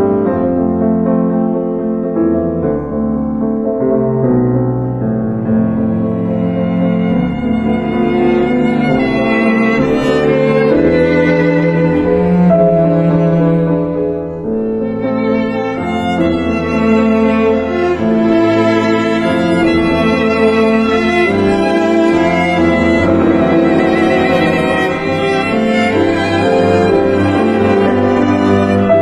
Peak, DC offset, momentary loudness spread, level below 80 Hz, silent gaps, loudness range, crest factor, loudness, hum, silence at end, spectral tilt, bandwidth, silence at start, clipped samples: 0 dBFS; under 0.1%; 5 LU; -34 dBFS; none; 4 LU; 12 dB; -13 LUFS; none; 0 s; -7.5 dB/octave; 10.5 kHz; 0 s; under 0.1%